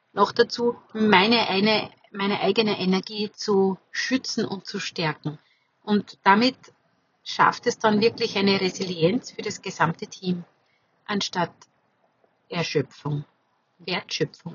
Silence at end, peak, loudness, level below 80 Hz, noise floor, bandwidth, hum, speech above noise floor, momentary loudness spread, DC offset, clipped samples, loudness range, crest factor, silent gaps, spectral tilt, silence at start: 0 s; -2 dBFS; -24 LUFS; -74 dBFS; -67 dBFS; 7.4 kHz; none; 43 dB; 12 LU; under 0.1%; under 0.1%; 8 LU; 22 dB; none; -4.5 dB/octave; 0.15 s